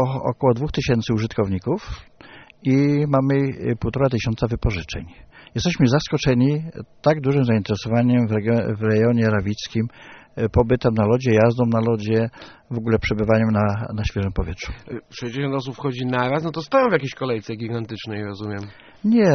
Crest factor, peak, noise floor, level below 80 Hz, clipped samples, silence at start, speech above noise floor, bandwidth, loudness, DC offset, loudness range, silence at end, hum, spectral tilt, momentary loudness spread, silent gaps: 18 dB; -2 dBFS; -45 dBFS; -38 dBFS; under 0.1%; 0 s; 25 dB; 6.6 kHz; -21 LUFS; under 0.1%; 4 LU; 0 s; none; -6.5 dB/octave; 12 LU; none